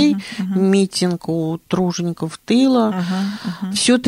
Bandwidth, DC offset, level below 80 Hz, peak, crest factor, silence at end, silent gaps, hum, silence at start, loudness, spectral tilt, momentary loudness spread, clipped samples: 15 kHz; under 0.1%; -58 dBFS; -4 dBFS; 14 dB; 0 s; none; none; 0 s; -19 LUFS; -5 dB/octave; 8 LU; under 0.1%